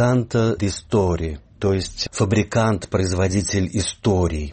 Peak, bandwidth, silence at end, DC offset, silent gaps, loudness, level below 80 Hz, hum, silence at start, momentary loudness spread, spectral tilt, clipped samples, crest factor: -6 dBFS; 8.8 kHz; 0 s; under 0.1%; none; -21 LUFS; -36 dBFS; none; 0 s; 5 LU; -5.5 dB/octave; under 0.1%; 14 dB